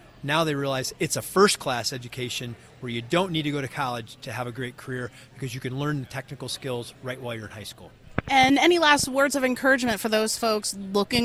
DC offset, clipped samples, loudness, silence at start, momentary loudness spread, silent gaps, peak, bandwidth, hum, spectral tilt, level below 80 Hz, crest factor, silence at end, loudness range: under 0.1%; under 0.1%; -25 LUFS; 0.2 s; 16 LU; none; -4 dBFS; 16 kHz; none; -3.5 dB/octave; -54 dBFS; 22 dB; 0 s; 11 LU